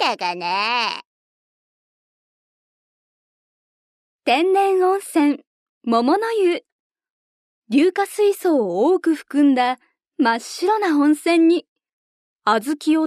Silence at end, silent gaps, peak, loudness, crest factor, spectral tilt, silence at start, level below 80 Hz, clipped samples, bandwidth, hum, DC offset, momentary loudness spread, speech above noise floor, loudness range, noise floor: 0 s; 1.05-4.19 s, 5.47-5.81 s, 6.72-6.90 s, 7.10-7.62 s, 11.68-11.76 s, 11.93-12.36 s; -4 dBFS; -19 LUFS; 16 dB; -4 dB/octave; 0 s; -74 dBFS; under 0.1%; 14 kHz; none; under 0.1%; 7 LU; over 72 dB; 8 LU; under -90 dBFS